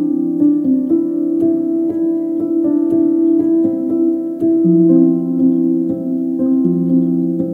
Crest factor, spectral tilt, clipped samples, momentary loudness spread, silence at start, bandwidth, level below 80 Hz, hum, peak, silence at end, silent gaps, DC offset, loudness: 14 dB; -12.5 dB/octave; under 0.1%; 6 LU; 0 s; 1.8 kHz; -60 dBFS; none; 0 dBFS; 0 s; none; under 0.1%; -15 LUFS